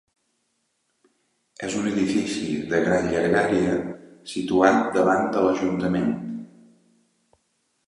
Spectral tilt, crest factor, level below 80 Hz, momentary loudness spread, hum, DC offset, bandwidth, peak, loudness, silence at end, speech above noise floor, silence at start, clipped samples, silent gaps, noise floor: -5.5 dB/octave; 20 dB; -54 dBFS; 14 LU; none; under 0.1%; 11.5 kHz; -4 dBFS; -22 LUFS; 1.4 s; 51 dB; 1.6 s; under 0.1%; none; -73 dBFS